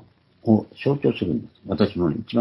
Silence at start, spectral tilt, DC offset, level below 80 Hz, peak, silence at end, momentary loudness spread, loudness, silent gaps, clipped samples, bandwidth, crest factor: 0.45 s; -10 dB/octave; under 0.1%; -56 dBFS; -4 dBFS; 0 s; 9 LU; -23 LUFS; none; under 0.1%; 5.8 kHz; 20 dB